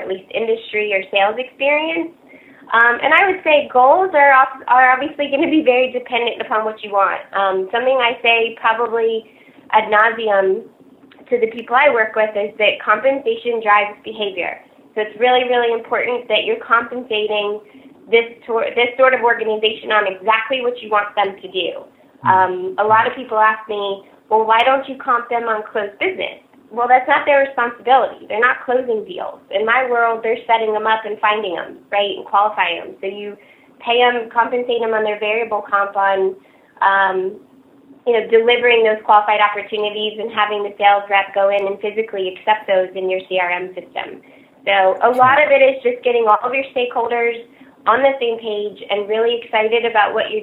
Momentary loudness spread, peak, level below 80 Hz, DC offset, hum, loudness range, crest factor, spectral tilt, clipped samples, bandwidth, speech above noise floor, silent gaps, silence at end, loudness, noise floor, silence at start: 11 LU; 0 dBFS; -66 dBFS; under 0.1%; none; 4 LU; 16 dB; -5.5 dB/octave; under 0.1%; 4.2 kHz; 30 dB; none; 0 s; -16 LUFS; -46 dBFS; 0 s